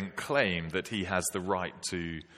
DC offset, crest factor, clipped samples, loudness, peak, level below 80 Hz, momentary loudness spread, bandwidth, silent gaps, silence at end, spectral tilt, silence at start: under 0.1%; 22 dB; under 0.1%; -32 LUFS; -10 dBFS; -58 dBFS; 7 LU; 15 kHz; none; 0 s; -3.5 dB/octave; 0 s